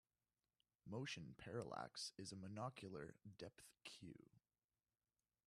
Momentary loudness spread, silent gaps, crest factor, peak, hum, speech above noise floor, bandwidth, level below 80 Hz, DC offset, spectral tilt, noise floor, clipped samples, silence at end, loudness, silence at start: 10 LU; none; 22 dB; -34 dBFS; none; over 36 dB; 13.5 kHz; -84 dBFS; under 0.1%; -4.5 dB/octave; under -90 dBFS; under 0.1%; 1.1 s; -54 LUFS; 0.85 s